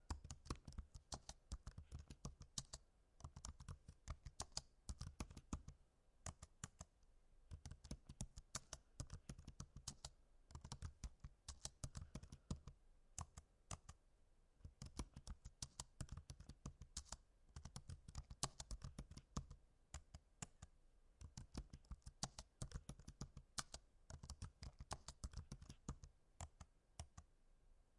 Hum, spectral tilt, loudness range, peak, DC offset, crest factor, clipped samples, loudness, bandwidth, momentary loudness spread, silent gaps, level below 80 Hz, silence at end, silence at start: none; -3.5 dB/octave; 3 LU; -24 dBFS; under 0.1%; 34 dB; under 0.1%; -57 LUFS; 11.5 kHz; 10 LU; none; -62 dBFS; 0 s; 0 s